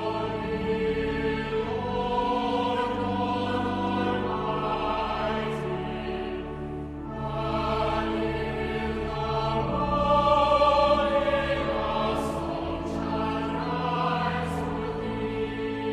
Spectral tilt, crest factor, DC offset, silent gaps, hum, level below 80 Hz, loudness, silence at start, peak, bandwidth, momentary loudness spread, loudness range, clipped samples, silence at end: -6.5 dB/octave; 16 dB; under 0.1%; none; none; -42 dBFS; -27 LUFS; 0 s; -10 dBFS; 13 kHz; 9 LU; 6 LU; under 0.1%; 0 s